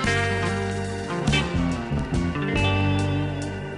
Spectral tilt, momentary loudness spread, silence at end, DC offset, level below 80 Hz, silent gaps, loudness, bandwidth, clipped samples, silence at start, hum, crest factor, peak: -5.5 dB/octave; 6 LU; 0 s; under 0.1%; -34 dBFS; none; -24 LUFS; 11.5 kHz; under 0.1%; 0 s; 50 Hz at -45 dBFS; 14 dB; -10 dBFS